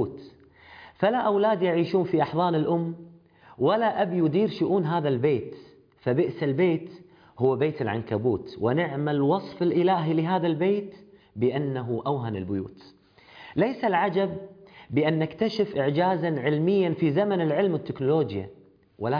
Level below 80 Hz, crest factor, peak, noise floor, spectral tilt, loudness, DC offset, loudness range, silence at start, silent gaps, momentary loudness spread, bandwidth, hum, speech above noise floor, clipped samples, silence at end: -64 dBFS; 16 dB; -8 dBFS; -53 dBFS; -9 dB/octave; -25 LUFS; under 0.1%; 3 LU; 0 s; none; 9 LU; 5.2 kHz; none; 28 dB; under 0.1%; 0 s